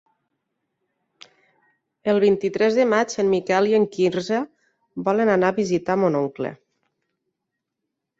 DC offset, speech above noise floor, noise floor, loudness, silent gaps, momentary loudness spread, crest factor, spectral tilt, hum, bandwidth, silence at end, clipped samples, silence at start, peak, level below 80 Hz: under 0.1%; 61 dB; -81 dBFS; -21 LUFS; none; 10 LU; 18 dB; -6 dB/octave; none; 8 kHz; 1.65 s; under 0.1%; 2.05 s; -6 dBFS; -64 dBFS